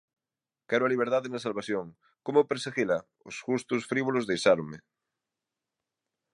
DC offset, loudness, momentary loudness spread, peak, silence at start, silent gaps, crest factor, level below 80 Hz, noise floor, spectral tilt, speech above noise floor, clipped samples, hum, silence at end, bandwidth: under 0.1%; -29 LUFS; 15 LU; -8 dBFS; 0.7 s; none; 22 dB; -72 dBFS; under -90 dBFS; -5 dB/octave; over 61 dB; under 0.1%; none; 1.55 s; 11.5 kHz